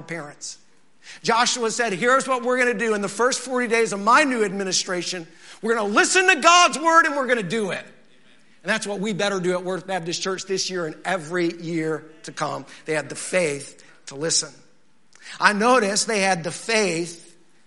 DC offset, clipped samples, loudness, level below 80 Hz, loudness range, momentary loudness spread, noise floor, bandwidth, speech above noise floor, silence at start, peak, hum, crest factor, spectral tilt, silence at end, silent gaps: 0.3%; under 0.1%; -21 LUFS; -74 dBFS; 8 LU; 15 LU; -61 dBFS; 11.5 kHz; 39 dB; 0 s; 0 dBFS; none; 22 dB; -2.5 dB/octave; 0.5 s; none